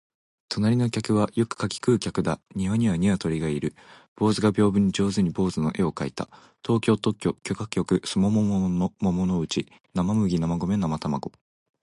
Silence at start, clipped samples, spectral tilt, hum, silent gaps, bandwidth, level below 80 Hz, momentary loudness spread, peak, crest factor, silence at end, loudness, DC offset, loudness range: 0.5 s; under 0.1%; -6.5 dB/octave; none; 4.08-4.16 s; 11.5 kHz; -48 dBFS; 8 LU; -8 dBFS; 16 dB; 0.55 s; -25 LUFS; under 0.1%; 2 LU